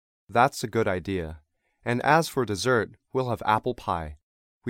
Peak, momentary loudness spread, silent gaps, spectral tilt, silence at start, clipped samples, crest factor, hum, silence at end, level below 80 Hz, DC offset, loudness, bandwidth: -6 dBFS; 10 LU; 4.23-4.61 s; -5 dB/octave; 0.3 s; under 0.1%; 22 dB; none; 0 s; -52 dBFS; under 0.1%; -26 LUFS; 16.5 kHz